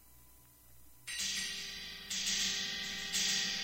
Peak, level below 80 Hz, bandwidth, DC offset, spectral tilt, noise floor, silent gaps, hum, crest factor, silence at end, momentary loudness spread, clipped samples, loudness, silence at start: -22 dBFS; -64 dBFS; 16 kHz; under 0.1%; 0.5 dB/octave; -61 dBFS; none; none; 18 dB; 0 s; 11 LU; under 0.1%; -35 LUFS; 0 s